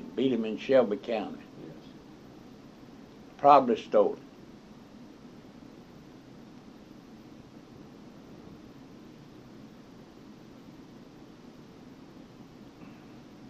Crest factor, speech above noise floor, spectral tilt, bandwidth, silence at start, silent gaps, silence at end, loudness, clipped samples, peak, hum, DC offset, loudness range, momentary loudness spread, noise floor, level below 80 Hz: 28 dB; 26 dB; -6.5 dB/octave; 7.8 kHz; 0 s; none; 0.05 s; -26 LUFS; under 0.1%; -4 dBFS; none; under 0.1%; 22 LU; 25 LU; -51 dBFS; -66 dBFS